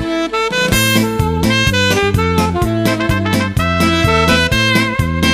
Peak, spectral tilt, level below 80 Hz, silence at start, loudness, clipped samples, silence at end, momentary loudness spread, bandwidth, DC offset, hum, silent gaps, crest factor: 0 dBFS; -4.5 dB/octave; -28 dBFS; 0 s; -13 LUFS; under 0.1%; 0 s; 4 LU; 15.5 kHz; under 0.1%; none; none; 14 dB